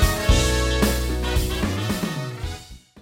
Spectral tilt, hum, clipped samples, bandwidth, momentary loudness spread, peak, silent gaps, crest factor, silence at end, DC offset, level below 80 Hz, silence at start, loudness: -4.5 dB/octave; none; under 0.1%; 16.5 kHz; 13 LU; -6 dBFS; none; 16 dB; 0.25 s; under 0.1%; -26 dBFS; 0 s; -23 LUFS